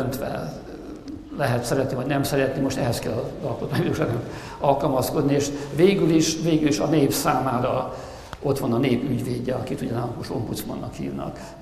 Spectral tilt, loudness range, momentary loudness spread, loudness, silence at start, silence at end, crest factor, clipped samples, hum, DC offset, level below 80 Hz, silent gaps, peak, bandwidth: -5.5 dB/octave; 5 LU; 12 LU; -24 LUFS; 0 s; 0 s; 20 dB; under 0.1%; none; under 0.1%; -46 dBFS; none; -4 dBFS; 14.5 kHz